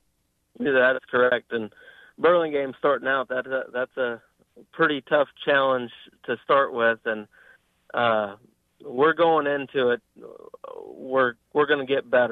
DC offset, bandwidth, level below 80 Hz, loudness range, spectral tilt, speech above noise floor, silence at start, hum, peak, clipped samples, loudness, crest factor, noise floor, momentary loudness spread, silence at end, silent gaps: under 0.1%; 4.3 kHz; -70 dBFS; 2 LU; -7 dB/octave; 48 dB; 0.6 s; none; -8 dBFS; under 0.1%; -23 LUFS; 16 dB; -71 dBFS; 14 LU; 0 s; none